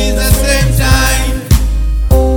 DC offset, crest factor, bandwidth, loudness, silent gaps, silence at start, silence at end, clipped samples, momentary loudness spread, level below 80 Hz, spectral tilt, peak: under 0.1%; 10 dB; over 20 kHz; -12 LUFS; none; 0 s; 0 s; 0.5%; 5 LU; -12 dBFS; -4.5 dB/octave; 0 dBFS